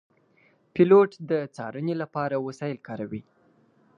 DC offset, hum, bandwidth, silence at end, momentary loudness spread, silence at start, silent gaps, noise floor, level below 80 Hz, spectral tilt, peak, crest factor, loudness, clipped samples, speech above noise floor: under 0.1%; none; 7.2 kHz; 0.8 s; 17 LU; 0.75 s; none; -63 dBFS; -68 dBFS; -8.5 dB/octave; -6 dBFS; 20 dB; -25 LUFS; under 0.1%; 39 dB